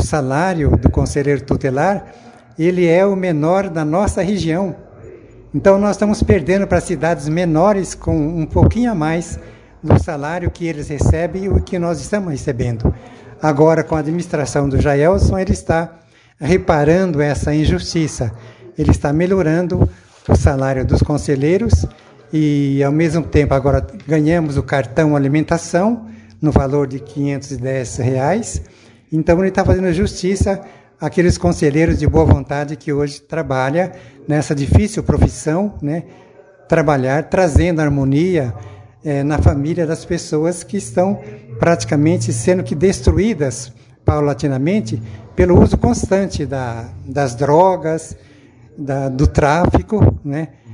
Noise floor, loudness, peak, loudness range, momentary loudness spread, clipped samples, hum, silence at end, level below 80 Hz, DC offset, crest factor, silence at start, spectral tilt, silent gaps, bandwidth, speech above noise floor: -44 dBFS; -16 LUFS; 0 dBFS; 3 LU; 10 LU; under 0.1%; none; 0 s; -30 dBFS; under 0.1%; 16 dB; 0 s; -7 dB/octave; none; 11 kHz; 29 dB